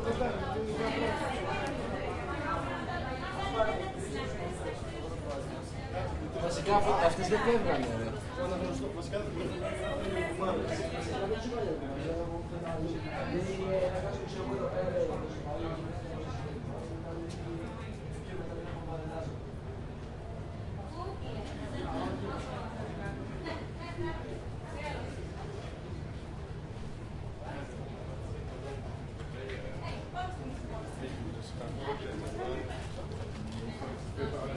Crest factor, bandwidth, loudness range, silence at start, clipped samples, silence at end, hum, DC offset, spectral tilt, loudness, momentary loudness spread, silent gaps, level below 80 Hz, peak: 22 dB; 11.5 kHz; 10 LU; 0 s; under 0.1%; 0 s; none; under 0.1%; -6 dB/octave; -36 LUFS; 10 LU; none; -46 dBFS; -14 dBFS